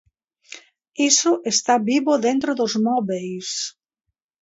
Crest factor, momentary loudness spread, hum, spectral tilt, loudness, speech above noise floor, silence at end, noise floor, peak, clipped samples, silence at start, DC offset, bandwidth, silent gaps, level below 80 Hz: 20 dB; 23 LU; none; -2.5 dB/octave; -20 LUFS; 60 dB; 0.7 s; -80 dBFS; -2 dBFS; under 0.1%; 0.5 s; under 0.1%; 8 kHz; none; -70 dBFS